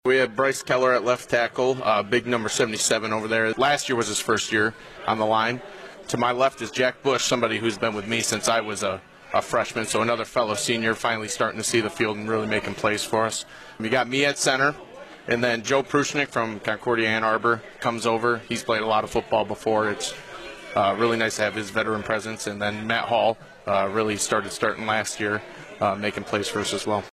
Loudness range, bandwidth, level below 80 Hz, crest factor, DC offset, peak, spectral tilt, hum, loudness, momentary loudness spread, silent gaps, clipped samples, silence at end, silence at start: 2 LU; 15 kHz; -58 dBFS; 16 dB; under 0.1%; -8 dBFS; -3 dB/octave; none; -24 LUFS; 6 LU; none; under 0.1%; 0.05 s; 0.05 s